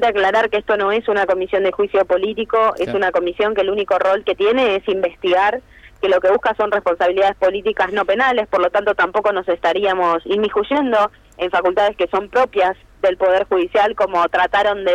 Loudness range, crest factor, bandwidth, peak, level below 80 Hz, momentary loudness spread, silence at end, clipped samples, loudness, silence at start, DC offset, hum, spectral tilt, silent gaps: 1 LU; 10 dB; 9.4 kHz; -6 dBFS; -48 dBFS; 3 LU; 0 s; under 0.1%; -17 LUFS; 0 s; under 0.1%; none; -5 dB/octave; none